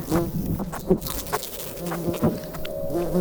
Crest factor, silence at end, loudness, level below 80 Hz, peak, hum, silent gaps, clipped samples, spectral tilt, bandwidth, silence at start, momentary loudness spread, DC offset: 20 dB; 0 s; -27 LUFS; -40 dBFS; -6 dBFS; none; none; under 0.1%; -6 dB/octave; over 20 kHz; 0 s; 6 LU; under 0.1%